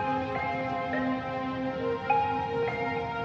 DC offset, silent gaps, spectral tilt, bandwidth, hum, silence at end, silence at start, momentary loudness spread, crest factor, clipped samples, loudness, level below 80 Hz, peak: under 0.1%; none; -7 dB/octave; 7.4 kHz; none; 0 s; 0 s; 5 LU; 18 dB; under 0.1%; -30 LUFS; -56 dBFS; -12 dBFS